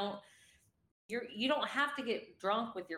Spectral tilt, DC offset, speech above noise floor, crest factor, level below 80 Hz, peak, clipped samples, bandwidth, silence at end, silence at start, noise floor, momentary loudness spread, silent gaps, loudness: -4 dB/octave; under 0.1%; 32 dB; 18 dB; -82 dBFS; -20 dBFS; under 0.1%; 16 kHz; 0 s; 0 s; -69 dBFS; 9 LU; 0.91-1.09 s; -36 LUFS